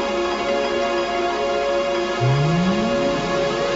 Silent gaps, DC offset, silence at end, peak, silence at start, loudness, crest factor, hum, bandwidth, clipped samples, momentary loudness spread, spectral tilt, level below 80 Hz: none; under 0.1%; 0 s; -8 dBFS; 0 s; -20 LUFS; 12 dB; none; 8 kHz; under 0.1%; 3 LU; -6 dB/octave; -44 dBFS